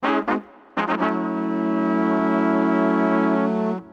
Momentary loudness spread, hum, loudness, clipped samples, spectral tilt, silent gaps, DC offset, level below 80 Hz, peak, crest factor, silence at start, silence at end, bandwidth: 6 LU; none; -21 LUFS; under 0.1%; -8 dB/octave; none; under 0.1%; -64 dBFS; -8 dBFS; 12 dB; 0 s; 0.05 s; 7 kHz